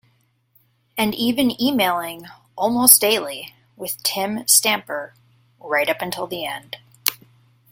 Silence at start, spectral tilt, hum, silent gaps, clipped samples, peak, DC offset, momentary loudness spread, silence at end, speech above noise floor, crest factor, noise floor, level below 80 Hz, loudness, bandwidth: 0.95 s; -1.5 dB/octave; none; none; under 0.1%; 0 dBFS; under 0.1%; 20 LU; 0.55 s; 43 dB; 22 dB; -63 dBFS; -62 dBFS; -18 LUFS; 16.5 kHz